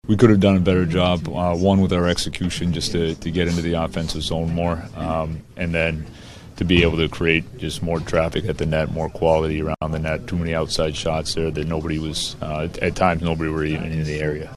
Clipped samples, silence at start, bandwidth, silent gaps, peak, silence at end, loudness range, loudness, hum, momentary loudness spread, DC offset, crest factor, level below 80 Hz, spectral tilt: under 0.1%; 0.05 s; 13.5 kHz; none; 0 dBFS; 0 s; 3 LU; -21 LUFS; none; 8 LU; under 0.1%; 20 dB; -36 dBFS; -6 dB/octave